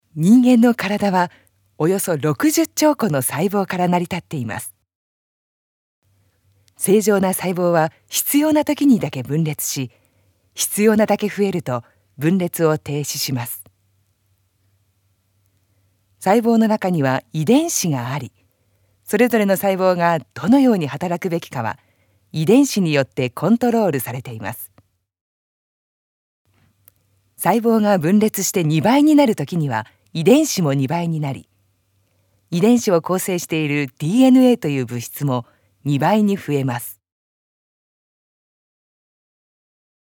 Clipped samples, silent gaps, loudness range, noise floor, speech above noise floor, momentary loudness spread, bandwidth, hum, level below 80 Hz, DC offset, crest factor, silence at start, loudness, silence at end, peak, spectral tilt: under 0.1%; 4.95-6.02 s, 25.21-26.45 s; 8 LU; -64 dBFS; 47 dB; 12 LU; 19 kHz; none; -66 dBFS; under 0.1%; 18 dB; 0.15 s; -18 LUFS; 3.1 s; 0 dBFS; -5.5 dB/octave